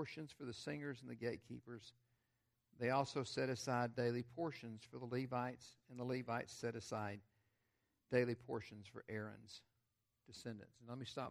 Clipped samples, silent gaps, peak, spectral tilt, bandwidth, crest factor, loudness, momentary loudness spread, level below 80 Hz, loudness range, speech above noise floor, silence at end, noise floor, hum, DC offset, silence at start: under 0.1%; none; -22 dBFS; -5.5 dB/octave; 14.5 kHz; 24 dB; -45 LUFS; 17 LU; -82 dBFS; 4 LU; 42 dB; 0 s; -87 dBFS; none; under 0.1%; 0 s